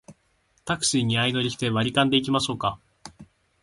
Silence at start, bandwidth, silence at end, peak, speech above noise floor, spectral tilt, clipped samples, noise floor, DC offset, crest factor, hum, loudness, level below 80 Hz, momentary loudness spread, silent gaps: 0.1 s; 11.5 kHz; 0.4 s; -6 dBFS; 43 dB; -4 dB/octave; under 0.1%; -67 dBFS; under 0.1%; 20 dB; none; -23 LUFS; -56 dBFS; 9 LU; none